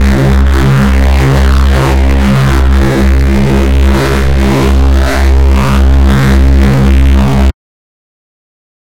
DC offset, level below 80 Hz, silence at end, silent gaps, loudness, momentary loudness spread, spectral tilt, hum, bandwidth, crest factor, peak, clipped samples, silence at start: 10%; -8 dBFS; 1.35 s; none; -8 LUFS; 2 LU; -7 dB/octave; none; 15.5 kHz; 8 dB; 0 dBFS; under 0.1%; 0 s